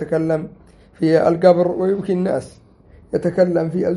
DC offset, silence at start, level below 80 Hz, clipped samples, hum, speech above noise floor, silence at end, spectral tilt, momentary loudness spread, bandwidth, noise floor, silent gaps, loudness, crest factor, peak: under 0.1%; 0 s; -52 dBFS; under 0.1%; none; 30 dB; 0 s; -8 dB/octave; 10 LU; 11.5 kHz; -47 dBFS; none; -18 LUFS; 18 dB; 0 dBFS